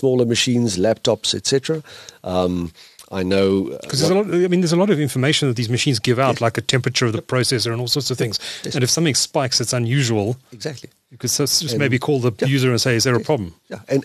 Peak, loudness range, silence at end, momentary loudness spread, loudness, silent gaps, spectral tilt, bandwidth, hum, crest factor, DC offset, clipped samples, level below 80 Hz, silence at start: -2 dBFS; 3 LU; 0 s; 10 LU; -19 LUFS; none; -4.5 dB/octave; 13.5 kHz; none; 16 dB; under 0.1%; under 0.1%; -54 dBFS; 0 s